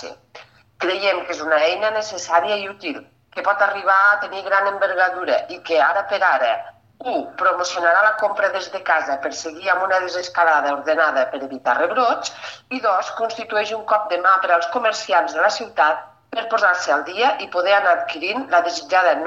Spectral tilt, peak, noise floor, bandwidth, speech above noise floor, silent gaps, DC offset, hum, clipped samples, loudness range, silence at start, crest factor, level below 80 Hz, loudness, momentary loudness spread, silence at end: -1.5 dB/octave; -4 dBFS; -45 dBFS; 8.2 kHz; 26 dB; none; under 0.1%; none; under 0.1%; 2 LU; 0 s; 16 dB; -72 dBFS; -19 LUFS; 9 LU; 0 s